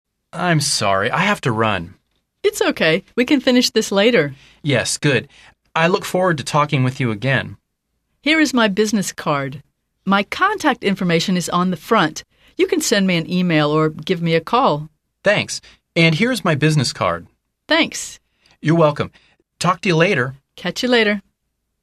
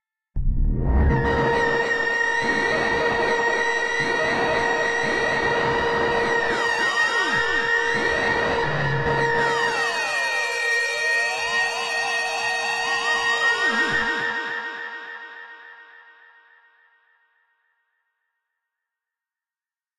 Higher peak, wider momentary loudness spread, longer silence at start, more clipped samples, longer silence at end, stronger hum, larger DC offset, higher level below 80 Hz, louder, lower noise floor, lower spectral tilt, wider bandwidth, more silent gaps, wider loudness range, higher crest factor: first, -2 dBFS vs -10 dBFS; first, 10 LU vs 7 LU; about the same, 0.35 s vs 0.35 s; neither; second, 0.65 s vs 4.15 s; neither; neither; second, -54 dBFS vs -34 dBFS; first, -18 LUFS vs -21 LUFS; second, -73 dBFS vs under -90 dBFS; about the same, -4.5 dB/octave vs -4 dB/octave; about the same, 14 kHz vs 14 kHz; neither; about the same, 2 LU vs 4 LU; about the same, 16 dB vs 14 dB